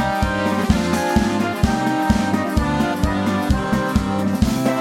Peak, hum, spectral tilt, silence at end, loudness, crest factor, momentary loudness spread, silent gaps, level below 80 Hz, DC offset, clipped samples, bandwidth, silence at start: -2 dBFS; none; -6 dB/octave; 0 s; -19 LUFS; 18 dB; 2 LU; none; -28 dBFS; under 0.1%; under 0.1%; 16.5 kHz; 0 s